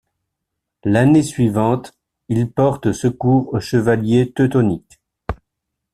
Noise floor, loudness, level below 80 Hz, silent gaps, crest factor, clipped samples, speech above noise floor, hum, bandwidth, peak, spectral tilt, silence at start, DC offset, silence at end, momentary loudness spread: -79 dBFS; -17 LUFS; -44 dBFS; none; 16 dB; under 0.1%; 63 dB; none; 13 kHz; -2 dBFS; -7.5 dB/octave; 0.85 s; under 0.1%; 0.6 s; 15 LU